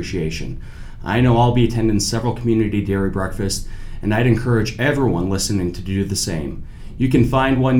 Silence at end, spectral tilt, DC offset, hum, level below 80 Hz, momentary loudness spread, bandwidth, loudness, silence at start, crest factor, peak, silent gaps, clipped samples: 0 s; -5.5 dB/octave; under 0.1%; none; -30 dBFS; 14 LU; 16.5 kHz; -19 LUFS; 0 s; 16 dB; -2 dBFS; none; under 0.1%